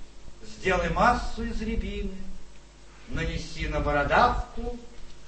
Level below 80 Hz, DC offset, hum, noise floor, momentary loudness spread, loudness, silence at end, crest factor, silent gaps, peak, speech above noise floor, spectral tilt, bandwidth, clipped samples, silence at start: -36 dBFS; under 0.1%; none; -47 dBFS; 16 LU; -27 LUFS; 0 s; 20 dB; none; -8 dBFS; 21 dB; -5.5 dB/octave; 8.8 kHz; under 0.1%; 0 s